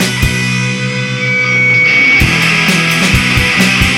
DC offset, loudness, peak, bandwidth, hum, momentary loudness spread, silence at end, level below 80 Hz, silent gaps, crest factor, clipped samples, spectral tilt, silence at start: under 0.1%; -9 LUFS; 0 dBFS; 17 kHz; none; 8 LU; 0 s; -26 dBFS; none; 10 dB; under 0.1%; -3.5 dB/octave; 0 s